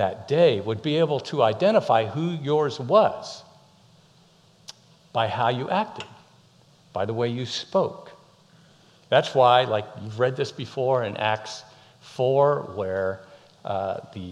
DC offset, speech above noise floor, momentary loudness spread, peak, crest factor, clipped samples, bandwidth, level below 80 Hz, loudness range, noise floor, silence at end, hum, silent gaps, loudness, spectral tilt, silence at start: under 0.1%; 34 dB; 19 LU; -4 dBFS; 20 dB; under 0.1%; 10.5 kHz; -70 dBFS; 7 LU; -57 dBFS; 0 s; none; none; -24 LUFS; -6 dB/octave; 0 s